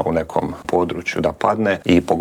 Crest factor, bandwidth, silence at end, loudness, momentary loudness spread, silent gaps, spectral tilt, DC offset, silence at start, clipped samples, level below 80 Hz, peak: 18 dB; 15 kHz; 0 s; -19 LUFS; 6 LU; none; -6.5 dB/octave; under 0.1%; 0 s; under 0.1%; -46 dBFS; 0 dBFS